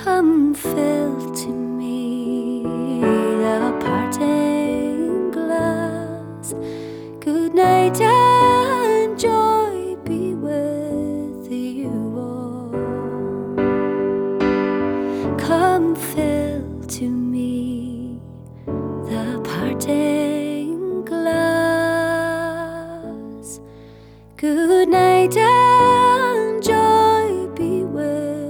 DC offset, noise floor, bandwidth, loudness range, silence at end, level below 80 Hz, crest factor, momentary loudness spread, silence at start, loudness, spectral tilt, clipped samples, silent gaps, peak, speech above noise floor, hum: under 0.1%; -43 dBFS; over 20 kHz; 9 LU; 0 s; -50 dBFS; 16 dB; 14 LU; 0 s; -19 LUFS; -5.5 dB/octave; under 0.1%; none; -4 dBFS; 26 dB; none